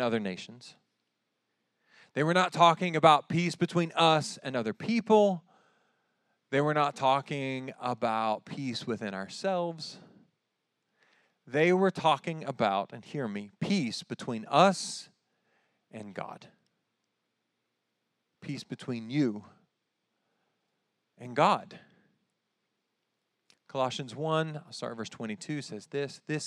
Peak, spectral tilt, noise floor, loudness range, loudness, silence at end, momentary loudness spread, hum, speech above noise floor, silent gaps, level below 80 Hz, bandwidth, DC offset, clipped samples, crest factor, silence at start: -6 dBFS; -5 dB/octave; -82 dBFS; 12 LU; -29 LUFS; 0 s; 16 LU; none; 53 dB; none; -86 dBFS; 12 kHz; under 0.1%; under 0.1%; 26 dB; 0 s